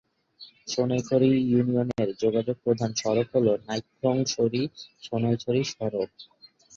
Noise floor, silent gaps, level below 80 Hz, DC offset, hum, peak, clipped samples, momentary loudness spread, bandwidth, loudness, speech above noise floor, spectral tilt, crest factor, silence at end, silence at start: -52 dBFS; none; -62 dBFS; under 0.1%; none; -8 dBFS; under 0.1%; 10 LU; 7.6 kHz; -26 LUFS; 27 dB; -6 dB/octave; 18 dB; 0.5 s; 0.4 s